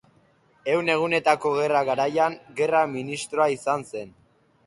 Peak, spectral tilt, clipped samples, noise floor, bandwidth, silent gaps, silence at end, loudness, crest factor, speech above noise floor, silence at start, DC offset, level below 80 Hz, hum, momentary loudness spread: -6 dBFS; -4.5 dB/octave; under 0.1%; -61 dBFS; 11.5 kHz; none; 0.6 s; -24 LUFS; 20 dB; 37 dB; 0.65 s; under 0.1%; -68 dBFS; none; 10 LU